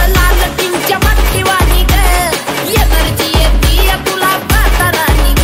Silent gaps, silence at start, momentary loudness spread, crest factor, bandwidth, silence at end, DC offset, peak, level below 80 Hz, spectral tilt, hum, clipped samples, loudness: none; 0 s; 2 LU; 10 dB; 16.5 kHz; 0 s; under 0.1%; 0 dBFS; -12 dBFS; -4 dB/octave; none; under 0.1%; -11 LUFS